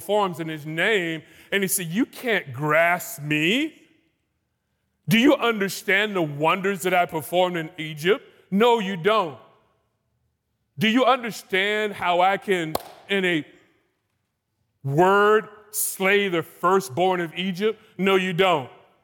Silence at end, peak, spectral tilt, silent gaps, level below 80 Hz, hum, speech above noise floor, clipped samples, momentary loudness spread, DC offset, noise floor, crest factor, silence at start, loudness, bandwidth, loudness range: 0.35 s; -6 dBFS; -4 dB/octave; none; -70 dBFS; none; 53 dB; under 0.1%; 9 LU; under 0.1%; -75 dBFS; 16 dB; 0 s; -22 LUFS; 18 kHz; 3 LU